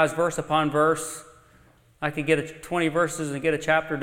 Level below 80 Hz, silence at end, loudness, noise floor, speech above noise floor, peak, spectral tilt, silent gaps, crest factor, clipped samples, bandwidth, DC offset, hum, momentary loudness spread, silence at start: -56 dBFS; 0 s; -25 LUFS; -57 dBFS; 33 dB; -6 dBFS; -4.5 dB/octave; none; 18 dB; under 0.1%; 16.5 kHz; under 0.1%; none; 8 LU; 0 s